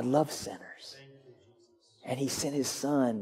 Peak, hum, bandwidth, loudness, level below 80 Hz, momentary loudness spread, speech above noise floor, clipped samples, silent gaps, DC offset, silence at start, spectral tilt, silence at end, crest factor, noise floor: -14 dBFS; none; 16 kHz; -32 LUFS; -68 dBFS; 19 LU; 33 dB; under 0.1%; none; under 0.1%; 0 s; -4.5 dB/octave; 0 s; 20 dB; -64 dBFS